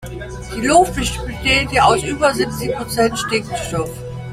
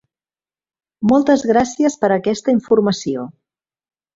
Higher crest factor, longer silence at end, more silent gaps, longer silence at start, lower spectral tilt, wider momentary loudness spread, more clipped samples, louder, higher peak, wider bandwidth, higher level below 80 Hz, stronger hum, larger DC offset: about the same, 18 dB vs 16 dB; second, 0 s vs 0.85 s; neither; second, 0 s vs 1 s; second, -4 dB/octave vs -5.5 dB/octave; first, 13 LU vs 9 LU; neither; about the same, -17 LUFS vs -16 LUFS; about the same, 0 dBFS vs -2 dBFS; first, 16 kHz vs 7.8 kHz; first, -34 dBFS vs -54 dBFS; neither; neither